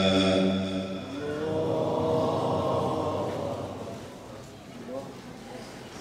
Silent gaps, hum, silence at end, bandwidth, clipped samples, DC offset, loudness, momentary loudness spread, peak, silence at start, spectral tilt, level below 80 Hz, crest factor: none; none; 0 s; 14.5 kHz; under 0.1%; under 0.1%; -29 LUFS; 18 LU; -12 dBFS; 0 s; -6 dB/octave; -60 dBFS; 18 dB